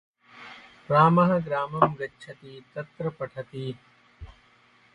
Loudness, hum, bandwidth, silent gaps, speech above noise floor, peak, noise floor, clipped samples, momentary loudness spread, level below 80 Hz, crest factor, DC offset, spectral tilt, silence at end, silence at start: -25 LUFS; none; 6.8 kHz; none; 34 dB; -4 dBFS; -60 dBFS; under 0.1%; 26 LU; -58 dBFS; 22 dB; under 0.1%; -8.5 dB/octave; 0.65 s; 0.35 s